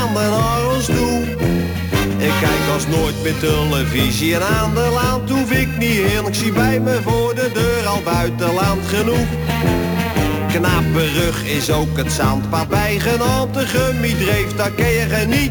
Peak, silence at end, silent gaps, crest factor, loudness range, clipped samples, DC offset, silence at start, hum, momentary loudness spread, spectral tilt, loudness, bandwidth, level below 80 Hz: -4 dBFS; 0 s; none; 12 dB; 1 LU; under 0.1%; under 0.1%; 0 s; none; 3 LU; -5 dB/octave; -17 LUFS; 19.5 kHz; -30 dBFS